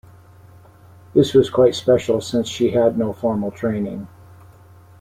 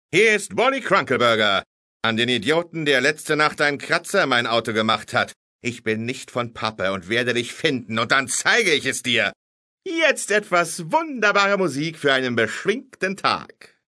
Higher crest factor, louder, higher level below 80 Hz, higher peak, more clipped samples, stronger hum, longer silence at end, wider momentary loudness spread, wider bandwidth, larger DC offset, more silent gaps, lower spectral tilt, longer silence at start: about the same, 18 dB vs 20 dB; about the same, -19 LUFS vs -20 LUFS; first, -54 dBFS vs -66 dBFS; about the same, -2 dBFS vs -2 dBFS; neither; neither; first, 0.95 s vs 0.45 s; about the same, 10 LU vs 9 LU; first, 15 kHz vs 11 kHz; neither; second, none vs 1.66-2.00 s, 5.36-5.59 s, 9.36-9.78 s; first, -6.5 dB/octave vs -3 dB/octave; first, 1.15 s vs 0.1 s